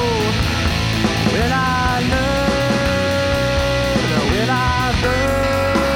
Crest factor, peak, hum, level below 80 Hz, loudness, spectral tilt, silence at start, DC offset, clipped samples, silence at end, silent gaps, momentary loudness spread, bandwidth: 14 dB; -2 dBFS; none; -28 dBFS; -17 LUFS; -5 dB/octave; 0 s; under 0.1%; under 0.1%; 0 s; none; 1 LU; 19 kHz